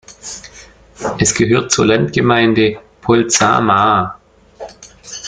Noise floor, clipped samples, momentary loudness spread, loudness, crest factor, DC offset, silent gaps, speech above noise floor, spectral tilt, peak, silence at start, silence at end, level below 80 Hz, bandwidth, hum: -41 dBFS; under 0.1%; 19 LU; -13 LUFS; 16 dB; under 0.1%; none; 28 dB; -4 dB/octave; 0 dBFS; 0.1 s; 0 s; -44 dBFS; 9.6 kHz; none